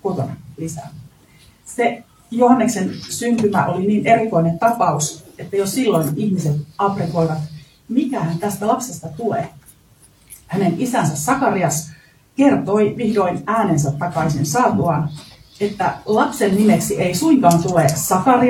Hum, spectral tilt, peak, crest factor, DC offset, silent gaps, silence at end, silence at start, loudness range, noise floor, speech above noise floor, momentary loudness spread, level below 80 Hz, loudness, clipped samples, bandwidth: none; -5.5 dB/octave; 0 dBFS; 18 dB; under 0.1%; none; 0 s; 0.05 s; 5 LU; -51 dBFS; 34 dB; 13 LU; -52 dBFS; -18 LUFS; under 0.1%; 19 kHz